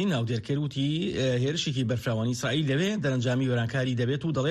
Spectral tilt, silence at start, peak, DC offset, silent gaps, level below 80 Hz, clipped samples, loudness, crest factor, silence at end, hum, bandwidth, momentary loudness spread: -6 dB/octave; 0 s; -16 dBFS; under 0.1%; none; -58 dBFS; under 0.1%; -27 LUFS; 12 dB; 0 s; none; 13 kHz; 2 LU